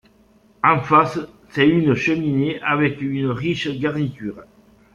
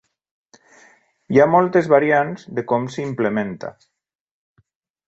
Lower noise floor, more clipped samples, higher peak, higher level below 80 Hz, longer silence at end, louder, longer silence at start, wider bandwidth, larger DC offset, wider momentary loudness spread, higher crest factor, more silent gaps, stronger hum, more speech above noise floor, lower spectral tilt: about the same, -54 dBFS vs -54 dBFS; neither; about the same, -2 dBFS vs -2 dBFS; first, -54 dBFS vs -62 dBFS; second, 0.5 s vs 1.35 s; about the same, -19 LUFS vs -18 LUFS; second, 0.65 s vs 1.3 s; about the same, 7.4 kHz vs 8 kHz; neither; second, 11 LU vs 14 LU; about the same, 18 dB vs 20 dB; neither; neither; about the same, 35 dB vs 36 dB; about the same, -7 dB/octave vs -7.5 dB/octave